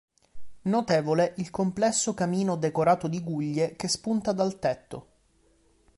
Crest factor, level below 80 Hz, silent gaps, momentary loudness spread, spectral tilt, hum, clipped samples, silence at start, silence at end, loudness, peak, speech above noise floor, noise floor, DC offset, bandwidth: 18 dB; -60 dBFS; none; 7 LU; -5 dB/octave; none; under 0.1%; 0.35 s; 0.95 s; -27 LUFS; -10 dBFS; 38 dB; -64 dBFS; under 0.1%; 11.5 kHz